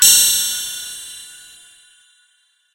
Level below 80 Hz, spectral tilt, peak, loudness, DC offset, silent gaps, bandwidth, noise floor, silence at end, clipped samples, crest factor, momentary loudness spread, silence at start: -56 dBFS; 3 dB/octave; 0 dBFS; -14 LUFS; under 0.1%; none; 16 kHz; -61 dBFS; 1.4 s; under 0.1%; 20 dB; 24 LU; 0 s